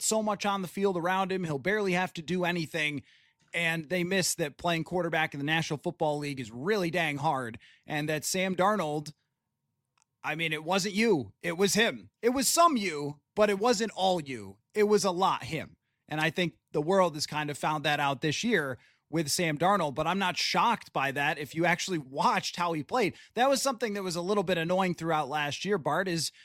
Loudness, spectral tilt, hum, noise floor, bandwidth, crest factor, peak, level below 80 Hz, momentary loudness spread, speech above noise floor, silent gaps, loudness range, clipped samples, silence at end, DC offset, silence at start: -29 LUFS; -4 dB/octave; none; -83 dBFS; 16.5 kHz; 18 dB; -10 dBFS; -66 dBFS; 8 LU; 54 dB; none; 4 LU; under 0.1%; 0.15 s; under 0.1%; 0 s